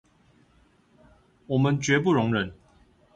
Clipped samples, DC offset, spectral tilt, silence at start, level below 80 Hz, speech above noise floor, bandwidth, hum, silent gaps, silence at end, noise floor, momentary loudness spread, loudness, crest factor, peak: under 0.1%; under 0.1%; -6 dB/octave; 1.5 s; -58 dBFS; 38 dB; 9 kHz; none; none; 0.6 s; -61 dBFS; 7 LU; -24 LUFS; 18 dB; -10 dBFS